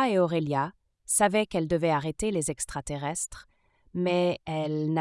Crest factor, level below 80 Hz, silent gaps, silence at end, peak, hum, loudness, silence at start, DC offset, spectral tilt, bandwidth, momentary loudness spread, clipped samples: 20 dB; -52 dBFS; none; 0 s; -8 dBFS; none; -28 LUFS; 0 s; under 0.1%; -4.5 dB/octave; 12 kHz; 9 LU; under 0.1%